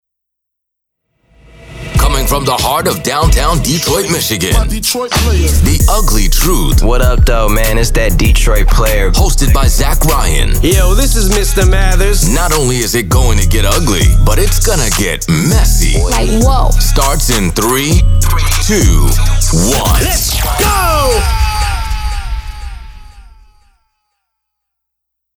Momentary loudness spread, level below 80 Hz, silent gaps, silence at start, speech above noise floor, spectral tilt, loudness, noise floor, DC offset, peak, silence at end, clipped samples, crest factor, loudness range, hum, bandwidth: 3 LU; -12 dBFS; none; 1.7 s; 67 dB; -4 dB/octave; -11 LUFS; -75 dBFS; under 0.1%; 0 dBFS; 2.2 s; under 0.1%; 10 dB; 4 LU; none; 18 kHz